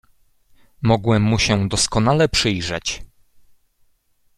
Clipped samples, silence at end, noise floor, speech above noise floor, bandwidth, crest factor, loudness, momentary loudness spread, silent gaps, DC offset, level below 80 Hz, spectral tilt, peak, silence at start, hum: under 0.1%; 1.3 s; -61 dBFS; 43 dB; 13 kHz; 18 dB; -18 LUFS; 8 LU; none; under 0.1%; -40 dBFS; -4.5 dB/octave; -2 dBFS; 0.8 s; none